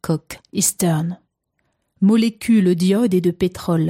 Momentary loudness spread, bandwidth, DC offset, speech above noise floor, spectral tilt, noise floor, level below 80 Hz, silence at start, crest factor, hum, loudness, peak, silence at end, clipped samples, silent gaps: 10 LU; 16 kHz; under 0.1%; 53 dB; -5.5 dB/octave; -71 dBFS; -52 dBFS; 0.05 s; 14 dB; none; -18 LUFS; -4 dBFS; 0 s; under 0.1%; none